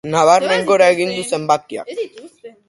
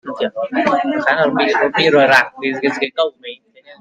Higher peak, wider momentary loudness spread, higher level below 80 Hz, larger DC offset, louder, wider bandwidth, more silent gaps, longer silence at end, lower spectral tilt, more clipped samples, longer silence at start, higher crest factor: about the same, 0 dBFS vs 0 dBFS; first, 15 LU vs 10 LU; about the same, -60 dBFS vs -62 dBFS; neither; about the same, -15 LUFS vs -15 LUFS; second, 11.5 kHz vs 14 kHz; neither; about the same, 0.2 s vs 0.1 s; about the same, -4 dB/octave vs -4.5 dB/octave; neither; about the same, 0.05 s vs 0.05 s; about the same, 16 dB vs 16 dB